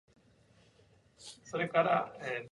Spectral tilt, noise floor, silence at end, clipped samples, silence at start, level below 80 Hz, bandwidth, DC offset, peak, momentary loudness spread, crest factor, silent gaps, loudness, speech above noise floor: -5 dB/octave; -66 dBFS; 0.05 s; under 0.1%; 1.2 s; -76 dBFS; 11.5 kHz; under 0.1%; -14 dBFS; 22 LU; 22 dB; none; -33 LUFS; 33 dB